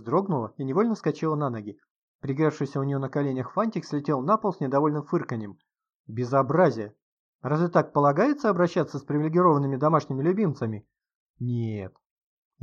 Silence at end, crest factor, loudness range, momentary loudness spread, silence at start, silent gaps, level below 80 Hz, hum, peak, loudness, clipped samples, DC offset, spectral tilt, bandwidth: 0.75 s; 18 dB; 4 LU; 14 LU; 0 s; 1.91-2.19 s, 5.94-6.04 s, 7.02-7.39 s, 11.15-11.34 s; -70 dBFS; none; -8 dBFS; -25 LUFS; under 0.1%; under 0.1%; -8.5 dB/octave; 7.4 kHz